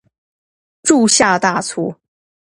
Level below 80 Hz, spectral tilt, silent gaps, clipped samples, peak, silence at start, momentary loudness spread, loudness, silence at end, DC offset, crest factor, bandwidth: -56 dBFS; -2.5 dB/octave; none; under 0.1%; 0 dBFS; 0.85 s; 12 LU; -14 LUFS; 0.6 s; under 0.1%; 18 dB; 11.5 kHz